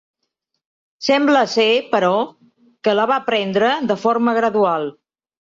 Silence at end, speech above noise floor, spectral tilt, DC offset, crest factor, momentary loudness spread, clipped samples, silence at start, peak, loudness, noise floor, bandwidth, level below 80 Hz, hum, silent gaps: 0.7 s; 59 dB; -4.5 dB/octave; under 0.1%; 16 dB; 9 LU; under 0.1%; 1 s; -4 dBFS; -17 LUFS; -75 dBFS; 7.6 kHz; -66 dBFS; none; none